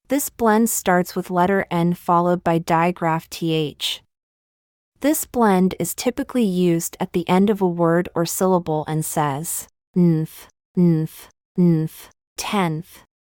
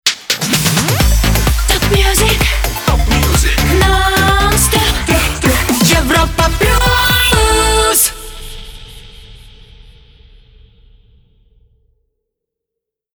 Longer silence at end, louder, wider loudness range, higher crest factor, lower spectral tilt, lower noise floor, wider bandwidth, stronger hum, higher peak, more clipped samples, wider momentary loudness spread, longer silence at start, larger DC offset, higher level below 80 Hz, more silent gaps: second, 0.45 s vs 3.75 s; second, -20 LUFS vs -11 LUFS; about the same, 3 LU vs 4 LU; about the same, 16 dB vs 14 dB; first, -5.5 dB/octave vs -3.5 dB/octave; first, under -90 dBFS vs -81 dBFS; second, 18 kHz vs over 20 kHz; neither; second, -4 dBFS vs 0 dBFS; neither; first, 8 LU vs 5 LU; about the same, 0.1 s vs 0.05 s; neither; second, -54 dBFS vs -18 dBFS; first, 4.23-4.92 s, 9.87-9.94 s, 10.65-10.75 s, 11.45-11.55 s, 12.27-12.36 s vs none